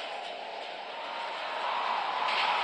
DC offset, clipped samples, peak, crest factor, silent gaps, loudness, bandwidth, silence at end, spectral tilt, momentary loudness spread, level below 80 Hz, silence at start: under 0.1%; under 0.1%; -16 dBFS; 16 dB; none; -33 LUFS; 10.5 kHz; 0 s; -1 dB/octave; 11 LU; under -90 dBFS; 0 s